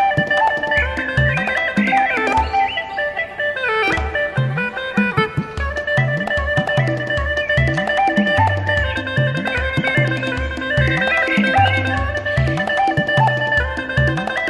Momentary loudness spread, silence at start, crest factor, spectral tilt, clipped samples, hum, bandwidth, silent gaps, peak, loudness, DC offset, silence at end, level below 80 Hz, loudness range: 5 LU; 0 s; 16 dB; -6 dB/octave; under 0.1%; none; 11.5 kHz; none; -2 dBFS; -17 LUFS; under 0.1%; 0 s; -32 dBFS; 2 LU